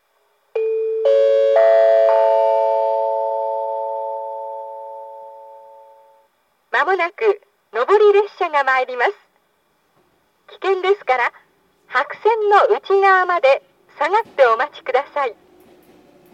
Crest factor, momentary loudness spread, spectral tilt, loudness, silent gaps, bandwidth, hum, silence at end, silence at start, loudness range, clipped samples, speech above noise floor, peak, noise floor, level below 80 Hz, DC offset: 18 dB; 14 LU; -3 dB/octave; -17 LUFS; none; 8.4 kHz; none; 1 s; 0.55 s; 9 LU; under 0.1%; 47 dB; 0 dBFS; -63 dBFS; -80 dBFS; under 0.1%